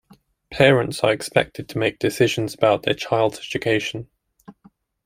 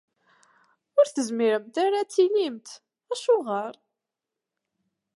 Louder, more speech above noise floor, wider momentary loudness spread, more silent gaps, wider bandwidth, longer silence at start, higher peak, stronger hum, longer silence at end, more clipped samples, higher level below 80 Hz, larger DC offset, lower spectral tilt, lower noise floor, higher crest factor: first, -20 LUFS vs -25 LUFS; second, 35 dB vs 63 dB; second, 10 LU vs 13 LU; neither; first, 16 kHz vs 11.5 kHz; second, 0.5 s vs 0.95 s; first, -2 dBFS vs -8 dBFS; neither; second, 0.55 s vs 1.45 s; neither; first, -54 dBFS vs -86 dBFS; neither; first, -5 dB/octave vs -3.5 dB/octave; second, -55 dBFS vs -87 dBFS; about the same, 20 dB vs 18 dB